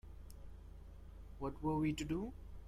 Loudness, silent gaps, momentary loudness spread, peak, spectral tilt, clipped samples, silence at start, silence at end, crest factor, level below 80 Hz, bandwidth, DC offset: -41 LUFS; none; 20 LU; -26 dBFS; -6.5 dB/octave; under 0.1%; 0.05 s; 0 s; 16 dB; -54 dBFS; 14.5 kHz; under 0.1%